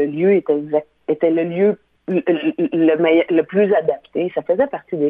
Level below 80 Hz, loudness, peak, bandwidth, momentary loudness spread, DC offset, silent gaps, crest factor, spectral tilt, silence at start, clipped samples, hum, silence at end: -62 dBFS; -18 LUFS; -4 dBFS; 3.8 kHz; 7 LU; under 0.1%; none; 14 dB; -10 dB/octave; 0 s; under 0.1%; none; 0 s